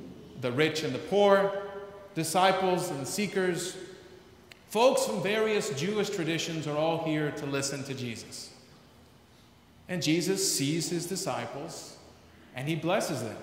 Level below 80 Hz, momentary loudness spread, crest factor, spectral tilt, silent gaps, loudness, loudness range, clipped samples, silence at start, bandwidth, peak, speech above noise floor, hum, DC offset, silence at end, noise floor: -68 dBFS; 16 LU; 22 dB; -4 dB/octave; none; -29 LUFS; 5 LU; under 0.1%; 0 s; 16 kHz; -8 dBFS; 29 dB; none; under 0.1%; 0 s; -58 dBFS